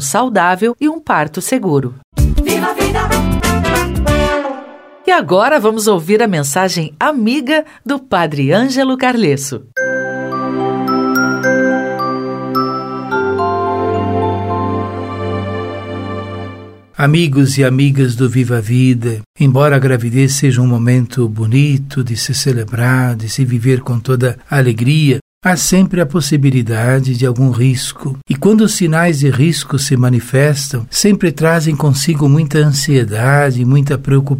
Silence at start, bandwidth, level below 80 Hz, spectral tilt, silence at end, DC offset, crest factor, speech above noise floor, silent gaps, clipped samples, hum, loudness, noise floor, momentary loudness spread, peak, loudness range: 0 s; 16.5 kHz; -30 dBFS; -5.5 dB/octave; 0 s; under 0.1%; 12 dB; 21 dB; 2.04-2.12 s, 19.26-19.34 s, 25.21-25.41 s; under 0.1%; none; -13 LUFS; -34 dBFS; 8 LU; 0 dBFS; 4 LU